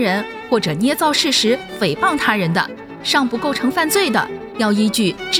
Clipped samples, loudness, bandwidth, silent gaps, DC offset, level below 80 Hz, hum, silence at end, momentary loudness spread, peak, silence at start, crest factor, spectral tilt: under 0.1%; -17 LUFS; 18.5 kHz; none; under 0.1%; -52 dBFS; none; 0 s; 6 LU; -2 dBFS; 0 s; 14 dB; -3.5 dB/octave